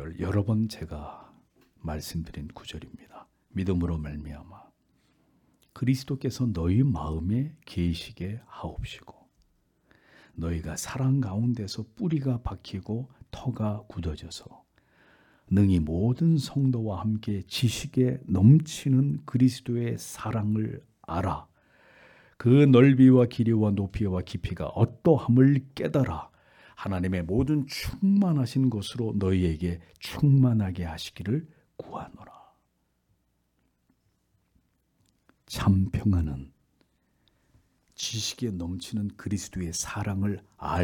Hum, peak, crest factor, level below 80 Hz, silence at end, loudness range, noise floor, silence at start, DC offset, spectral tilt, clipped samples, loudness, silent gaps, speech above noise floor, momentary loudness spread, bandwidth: none; -6 dBFS; 20 dB; -48 dBFS; 0 s; 13 LU; -73 dBFS; 0 s; under 0.1%; -7 dB/octave; under 0.1%; -26 LUFS; none; 47 dB; 17 LU; 18 kHz